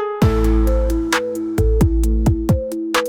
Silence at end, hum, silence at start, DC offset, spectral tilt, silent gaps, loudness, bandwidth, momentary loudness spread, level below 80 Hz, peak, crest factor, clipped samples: 0 s; none; 0 s; under 0.1%; -6.5 dB/octave; none; -18 LUFS; 17.5 kHz; 4 LU; -20 dBFS; -4 dBFS; 12 dB; under 0.1%